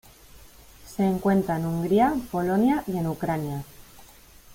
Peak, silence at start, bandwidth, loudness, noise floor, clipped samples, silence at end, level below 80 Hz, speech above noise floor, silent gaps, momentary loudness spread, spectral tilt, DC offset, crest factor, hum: -8 dBFS; 0.35 s; 16.5 kHz; -25 LUFS; -50 dBFS; under 0.1%; 0 s; -52 dBFS; 26 dB; none; 12 LU; -7.5 dB/octave; under 0.1%; 18 dB; none